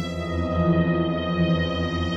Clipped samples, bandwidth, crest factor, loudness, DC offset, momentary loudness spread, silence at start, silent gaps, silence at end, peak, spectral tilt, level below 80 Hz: under 0.1%; 7.8 kHz; 14 dB; -23 LUFS; under 0.1%; 5 LU; 0 s; none; 0 s; -10 dBFS; -7.5 dB/octave; -38 dBFS